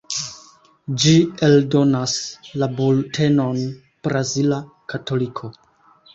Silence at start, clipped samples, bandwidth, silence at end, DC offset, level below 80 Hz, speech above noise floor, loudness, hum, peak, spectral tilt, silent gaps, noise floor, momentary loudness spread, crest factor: 0.1 s; under 0.1%; 8.2 kHz; 0.65 s; under 0.1%; -56 dBFS; 35 dB; -19 LUFS; none; -4 dBFS; -5.5 dB/octave; none; -53 dBFS; 15 LU; 16 dB